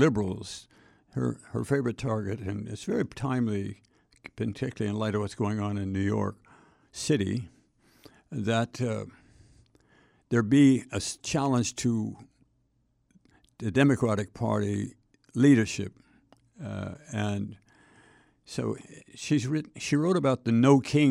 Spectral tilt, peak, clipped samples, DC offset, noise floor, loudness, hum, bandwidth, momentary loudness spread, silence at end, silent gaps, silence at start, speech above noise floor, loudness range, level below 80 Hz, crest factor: -6 dB/octave; -8 dBFS; under 0.1%; under 0.1%; -71 dBFS; -28 LUFS; none; 12 kHz; 18 LU; 0 s; none; 0 s; 44 dB; 6 LU; -60 dBFS; 20 dB